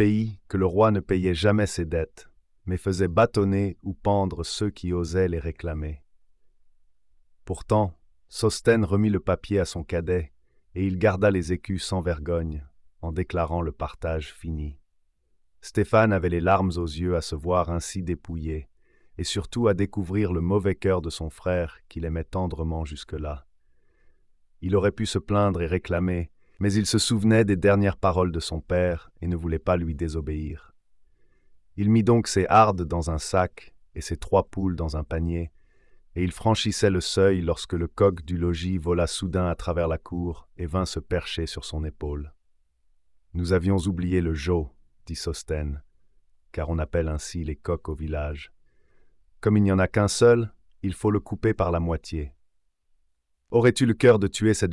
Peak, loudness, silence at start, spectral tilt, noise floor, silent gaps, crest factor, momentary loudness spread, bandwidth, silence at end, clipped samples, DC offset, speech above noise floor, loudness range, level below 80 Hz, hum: -6 dBFS; -25 LUFS; 0 s; -6 dB/octave; -70 dBFS; none; 18 dB; 14 LU; 12 kHz; 0 s; under 0.1%; under 0.1%; 46 dB; 7 LU; -42 dBFS; none